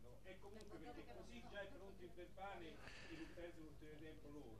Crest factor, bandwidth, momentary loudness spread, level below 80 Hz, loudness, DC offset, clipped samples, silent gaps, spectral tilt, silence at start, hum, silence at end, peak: 18 dB; 13.5 kHz; 5 LU; -68 dBFS; -58 LUFS; under 0.1%; under 0.1%; none; -5.5 dB/octave; 0 s; 50 Hz at -65 dBFS; 0 s; -40 dBFS